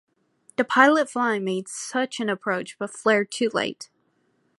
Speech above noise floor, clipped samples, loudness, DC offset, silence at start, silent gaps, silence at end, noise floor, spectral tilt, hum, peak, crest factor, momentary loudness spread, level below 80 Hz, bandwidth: 45 dB; under 0.1%; -23 LUFS; under 0.1%; 0.6 s; none; 0.75 s; -68 dBFS; -3.5 dB/octave; none; -2 dBFS; 24 dB; 14 LU; -76 dBFS; 11.5 kHz